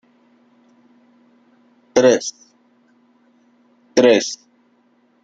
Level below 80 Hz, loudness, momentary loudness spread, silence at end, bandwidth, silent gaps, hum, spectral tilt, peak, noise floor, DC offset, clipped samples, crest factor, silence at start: -66 dBFS; -16 LUFS; 15 LU; 0.9 s; 7.8 kHz; none; none; -3.5 dB/octave; -2 dBFS; -59 dBFS; under 0.1%; under 0.1%; 20 dB; 1.95 s